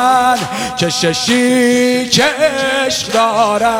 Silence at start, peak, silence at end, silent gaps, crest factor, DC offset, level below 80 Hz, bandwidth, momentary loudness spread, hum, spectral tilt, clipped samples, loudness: 0 s; 0 dBFS; 0 s; none; 12 dB; under 0.1%; -48 dBFS; 17 kHz; 4 LU; none; -3 dB/octave; under 0.1%; -13 LUFS